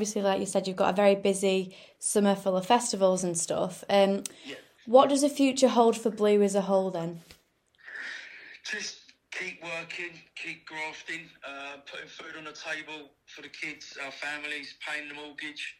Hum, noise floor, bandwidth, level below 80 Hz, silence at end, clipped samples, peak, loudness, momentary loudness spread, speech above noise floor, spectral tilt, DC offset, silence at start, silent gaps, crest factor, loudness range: none; -64 dBFS; 16 kHz; -74 dBFS; 0.05 s; under 0.1%; -6 dBFS; -28 LUFS; 18 LU; 36 dB; -4 dB/octave; under 0.1%; 0 s; none; 22 dB; 13 LU